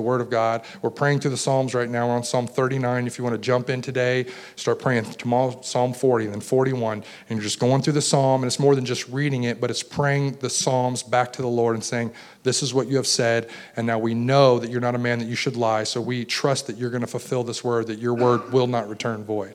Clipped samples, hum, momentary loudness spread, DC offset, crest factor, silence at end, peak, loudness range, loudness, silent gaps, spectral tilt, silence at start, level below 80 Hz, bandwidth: under 0.1%; none; 7 LU; under 0.1%; 18 dB; 0 s; -4 dBFS; 2 LU; -23 LUFS; none; -5 dB/octave; 0 s; -68 dBFS; 14.5 kHz